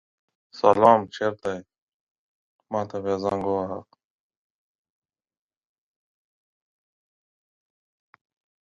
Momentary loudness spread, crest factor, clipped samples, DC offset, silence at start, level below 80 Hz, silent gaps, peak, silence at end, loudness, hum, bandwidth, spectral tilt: 16 LU; 28 dB; under 0.1%; under 0.1%; 0.55 s; -62 dBFS; 1.78-2.59 s; -2 dBFS; 4.8 s; -23 LUFS; none; 10 kHz; -6.5 dB/octave